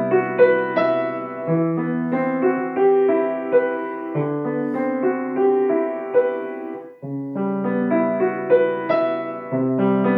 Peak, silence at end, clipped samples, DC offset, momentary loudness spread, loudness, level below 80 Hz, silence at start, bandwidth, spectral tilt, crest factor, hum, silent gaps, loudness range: -2 dBFS; 0 s; under 0.1%; under 0.1%; 10 LU; -20 LUFS; -76 dBFS; 0 s; 5 kHz; -10.5 dB/octave; 18 dB; none; none; 3 LU